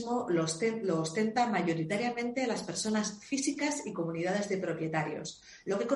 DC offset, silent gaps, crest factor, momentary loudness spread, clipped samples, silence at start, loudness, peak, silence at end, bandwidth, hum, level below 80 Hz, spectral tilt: under 0.1%; none; 16 dB; 6 LU; under 0.1%; 0 s; -32 LUFS; -16 dBFS; 0 s; 11.5 kHz; none; -72 dBFS; -4.5 dB/octave